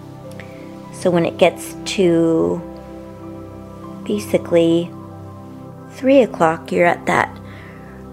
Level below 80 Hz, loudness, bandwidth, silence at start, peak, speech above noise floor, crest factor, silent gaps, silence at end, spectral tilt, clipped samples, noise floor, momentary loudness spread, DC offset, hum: -50 dBFS; -17 LUFS; 15 kHz; 0 s; 0 dBFS; 20 dB; 20 dB; none; 0 s; -6 dB/octave; under 0.1%; -36 dBFS; 21 LU; under 0.1%; none